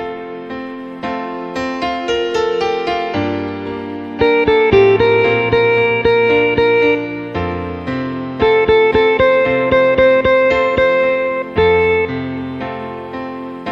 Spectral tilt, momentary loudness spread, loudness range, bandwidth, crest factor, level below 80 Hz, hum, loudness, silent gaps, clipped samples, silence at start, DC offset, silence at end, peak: -6.5 dB/octave; 14 LU; 7 LU; 7.6 kHz; 14 dB; -40 dBFS; none; -14 LUFS; none; under 0.1%; 0 s; under 0.1%; 0 s; 0 dBFS